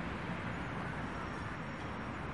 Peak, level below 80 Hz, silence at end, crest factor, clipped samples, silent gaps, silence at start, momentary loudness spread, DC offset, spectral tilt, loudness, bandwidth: -28 dBFS; -54 dBFS; 0 s; 12 dB; under 0.1%; none; 0 s; 2 LU; 0.1%; -6.5 dB/octave; -41 LUFS; 11.5 kHz